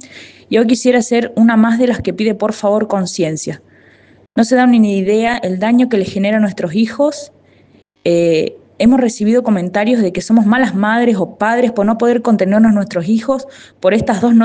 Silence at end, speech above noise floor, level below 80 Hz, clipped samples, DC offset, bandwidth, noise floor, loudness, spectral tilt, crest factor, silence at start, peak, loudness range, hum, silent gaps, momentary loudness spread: 0 s; 37 dB; -50 dBFS; under 0.1%; under 0.1%; 9.4 kHz; -49 dBFS; -13 LUFS; -6 dB/octave; 14 dB; 0.05 s; 0 dBFS; 3 LU; none; none; 7 LU